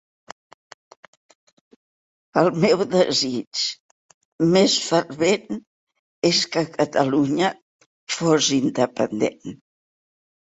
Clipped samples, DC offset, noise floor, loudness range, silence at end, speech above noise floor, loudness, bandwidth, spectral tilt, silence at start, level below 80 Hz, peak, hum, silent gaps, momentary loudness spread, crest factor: under 0.1%; under 0.1%; under -90 dBFS; 3 LU; 0.95 s; over 70 dB; -20 LUFS; 8.4 kHz; -4 dB/octave; 2.35 s; -62 dBFS; -2 dBFS; none; 3.47-3.51 s, 3.80-4.39 s, 5.67-5.87 s, 5.99-6.22 s, 7.62-7.79 s, 7.86-8.07 s; 8 LU; 20 dB